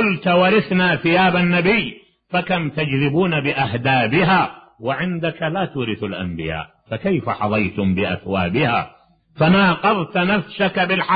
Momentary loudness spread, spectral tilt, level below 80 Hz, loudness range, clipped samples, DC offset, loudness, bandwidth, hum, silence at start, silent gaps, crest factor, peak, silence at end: 10 LU; -11 dB/octave; -48 dBFS; 5 LU; under 0.1%; under 0.1%; -18 LUFS; 5 kHz; none; 0 s; none; 14 dB; -4 dBFS; 0 s